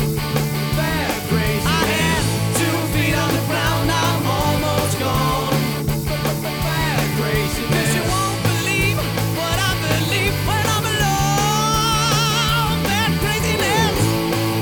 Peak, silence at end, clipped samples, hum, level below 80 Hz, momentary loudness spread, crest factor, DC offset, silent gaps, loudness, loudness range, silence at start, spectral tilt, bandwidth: -4 dBFS; 0 s; under 0.1%; none; -34 dBFS; 4 LU; 14 dB; 0.2%; none; -18 LUFS; 2 LU; 0 s; -4.5 dB/octave; 19.5 kHz